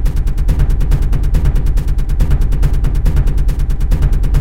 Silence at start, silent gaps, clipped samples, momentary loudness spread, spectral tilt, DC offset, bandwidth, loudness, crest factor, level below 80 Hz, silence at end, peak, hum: 0 s; none; under 0.1%; 3 LU; -7.5 dB/octave; 5%; 12.5 kHz; -17 LUFS; 10 dB; -12 dBFS; 0 s; 0 dBFS; none